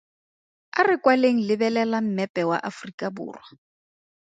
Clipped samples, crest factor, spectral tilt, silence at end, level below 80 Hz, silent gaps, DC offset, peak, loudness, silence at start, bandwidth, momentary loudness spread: under 0.1%; 20 dB; -6 dB/octave; 0.85 s; -74 dBFS; 2.29-2.34 s, 2.94-2.98 s; under 0.1%; -4 dBFS; -23 LUFS; 0.75 s; 9 kHz; 14 LU